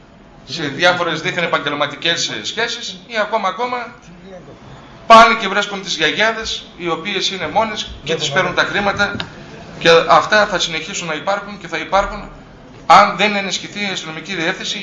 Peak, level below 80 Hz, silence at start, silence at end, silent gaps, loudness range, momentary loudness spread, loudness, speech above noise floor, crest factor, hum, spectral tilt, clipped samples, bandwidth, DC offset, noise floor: 0 dBFS; -44 dBFS; 0.45 s; 0 s; none; 4 LU; 15 LU; -15 LUFS; 22 dB; 16 dB; none; -3 dB/octave; 0.2%; 10 kHz; under 0.1%; -39 dBFS